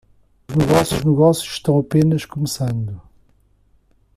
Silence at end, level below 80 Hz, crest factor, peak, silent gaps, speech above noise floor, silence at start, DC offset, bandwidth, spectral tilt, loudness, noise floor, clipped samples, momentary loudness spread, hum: 1.15 s; -44 dBFS; 18 dB; -2 dBFS; none; 40 dB; 0.5 s; under 0.1%; 15 kHz; -6.5 dB/octave; -18 LUFS; -57 dBFS; under 0.1%; 10 LU; none